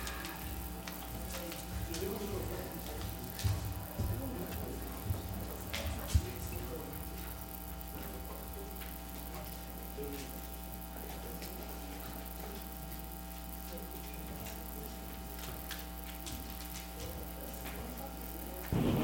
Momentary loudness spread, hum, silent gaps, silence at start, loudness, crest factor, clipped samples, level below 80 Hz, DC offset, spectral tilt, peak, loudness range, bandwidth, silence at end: 6 LU; none; none; 0 s; -42 LUFS; 24 dB; under 0.1%; -46 dBFS; under 0.1%; -5 dB/octave; -18 dBFS; 5 LU; 17 kHz; 0 s